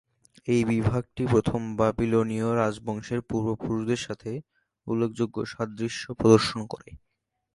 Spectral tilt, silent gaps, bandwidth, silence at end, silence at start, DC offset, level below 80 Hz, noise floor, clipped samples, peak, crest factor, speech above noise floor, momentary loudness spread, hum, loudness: -6.5 dB/octave; none; 11.5 kHz; 0.55 s; 0.45 s; under 0.1%; -50 dBFS; -79 dBFS; under 0.1%; -4 dBFS; 22 dB; 54 dB; 14 LU; none; -26 LUFS